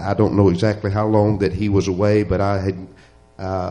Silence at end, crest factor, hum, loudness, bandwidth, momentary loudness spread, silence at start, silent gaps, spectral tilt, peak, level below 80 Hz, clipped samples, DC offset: 0 s; 16 dB; none; -18 LUFS; 9.4 kHz; 10 LU; 0 s; none; -8 dB/octave; -2 dBFS; -40 dBFS; under 0.1%; under 0.1%